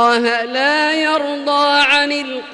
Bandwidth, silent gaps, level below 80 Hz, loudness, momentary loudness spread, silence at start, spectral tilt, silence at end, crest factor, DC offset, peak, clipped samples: 11.5 kHz; none; -60 dBFS; -14 LUFS; 7 LU; 0 s; -1.5 dB/octave; 0 s; 12 dB; under 0.1%; -2 dBFS; under 0.1%